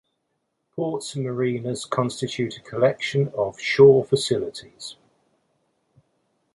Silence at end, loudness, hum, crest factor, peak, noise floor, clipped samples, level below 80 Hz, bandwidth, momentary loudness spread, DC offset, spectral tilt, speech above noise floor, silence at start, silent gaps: 1.6 s; -22 LUFS; none; 22 dB; -2 dBFS; -75 dBFS; under 0.1%; -62 dBFS; 11.5 kHz; 21 LU; under 0.1%; -5.5 dB/octave; 54 dB; 0.75 s; none